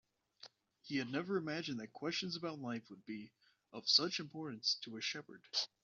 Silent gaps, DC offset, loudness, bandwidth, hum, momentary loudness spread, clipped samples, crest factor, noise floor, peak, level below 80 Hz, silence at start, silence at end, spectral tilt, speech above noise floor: none; under 0.1%; -39 LUFS; 7.4 kHz; none; 22 LU; under 0.1%; 26 dB; -62 dBFS; -16 dBFS; -84 dBFS; 0.4 s; 0.2 s; -2 dB/octave; 22 dB